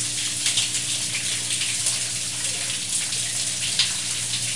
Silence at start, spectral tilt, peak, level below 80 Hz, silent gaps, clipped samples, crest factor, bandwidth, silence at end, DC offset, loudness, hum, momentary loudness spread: 0 s; 0.5 dB/octave; -6 dBFS; -60 dBFS; none; under 0.1%; 18 dB; 11.5 kHz; 0 s; 0.6%; -22 LUFS; none; 3 LU